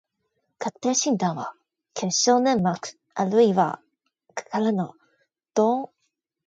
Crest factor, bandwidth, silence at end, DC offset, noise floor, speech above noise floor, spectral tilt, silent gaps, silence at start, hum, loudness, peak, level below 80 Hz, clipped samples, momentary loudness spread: 18 dB; 9.2 kHz; 0.6 s; under 0.1%; -77 dBFS; 54 dB; -4.5 dB/octave; none; 0.6 s; none; -24 LUFS; -6 dBFS; -68 dBFS; under 0.1%; 18 LU